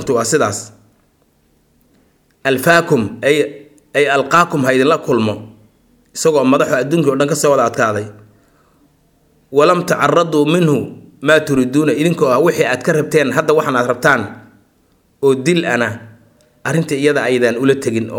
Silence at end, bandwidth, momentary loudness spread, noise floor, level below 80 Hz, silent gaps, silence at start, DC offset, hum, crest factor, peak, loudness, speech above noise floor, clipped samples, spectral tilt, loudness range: 0 s; 19 kHz; 9 LU; -57 dBFS; -56 dBFS; none; 0 s; under 0.1%; none; 16 dB; 0 dBFS; -14 LUFS; 43 dB; under 0.1%; -5 dB/octave; 4 LU